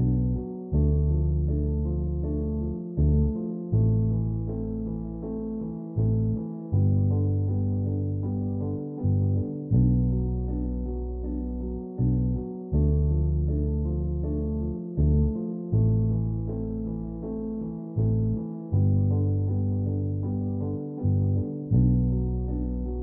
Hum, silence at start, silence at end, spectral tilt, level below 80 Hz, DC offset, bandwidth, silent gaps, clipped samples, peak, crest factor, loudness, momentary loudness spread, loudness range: none; 0 s; 0 s; -15.5 dB/octave; -32 dBFS; under 0.1%; 1.3 kHz; none; under 0.1%; -10 dBFS; 14 dB; -27 LUFS; 9 LU; 2 LU